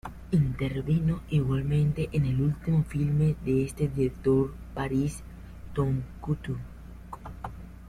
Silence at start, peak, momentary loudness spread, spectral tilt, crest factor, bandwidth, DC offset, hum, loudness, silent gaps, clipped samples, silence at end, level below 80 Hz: 0.05 s; -12 dBFS; 17 LU; -8.5 dB/octave; 14 dB; 12 kHz; under 0.1%; none; -28 LUFS; none; under 0.1%; 0 s; -44 dBFS